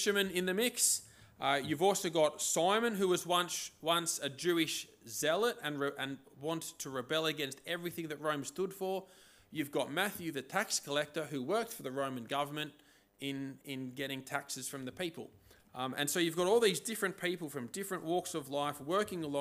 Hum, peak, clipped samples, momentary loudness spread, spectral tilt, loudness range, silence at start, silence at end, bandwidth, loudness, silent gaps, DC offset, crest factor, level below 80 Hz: none; -16 dBFS; under 0.1%; 11 LU; -3 dB/octave; 7 LU; 0 s; 0 s; 16 kHz; -35 LUFS; none; under 0.1%; 20 dB; -78 dBFS